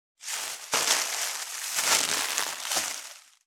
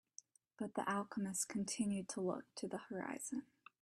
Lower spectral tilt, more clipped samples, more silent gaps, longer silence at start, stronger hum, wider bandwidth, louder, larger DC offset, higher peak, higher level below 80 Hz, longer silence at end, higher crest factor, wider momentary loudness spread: second, 2 dB/octave vs -4 dB/octave; neither; neither; second, 0.2 s vs 0.6 s; neither; first, over 20 kHz vs 14 kHz; first, -26 LUFS vs -43 LUFS; neither; first, -6 dBFS vs -26 dBFS; about the same, -76 dBFS vs -80 dBFS; second, 0.25 s vs 0.4 s; first, 24 dB vs 18 dB; about the same, 10 LU vs 8 LU